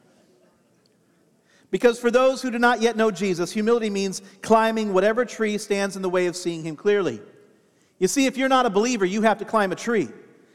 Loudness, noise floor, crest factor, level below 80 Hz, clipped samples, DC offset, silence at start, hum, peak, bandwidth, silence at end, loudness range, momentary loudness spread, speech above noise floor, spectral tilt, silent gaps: -22 LUFS; -62 dBFS; 20 dB; -64 dBFS; under 0.1%; under 0.1%; 1.7 s; none; -2 dBFS; 15 kHz; 0.4 s; 3 LU; 8 LU; 40 dB; -4.5 dB/octave; none